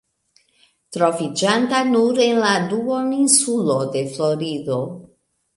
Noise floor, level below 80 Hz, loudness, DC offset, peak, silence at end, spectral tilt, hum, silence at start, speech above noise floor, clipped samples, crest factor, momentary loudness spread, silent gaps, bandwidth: -62 dBFS; -66 dBFS; -18 LUFS; under 0.1%; -2 dBFS; 0.5 s; -3.5 dB/octave; none; 0.9 s; 43 dB; under 0.1%; 18 dB; 10 LU; none; 11.5 kHz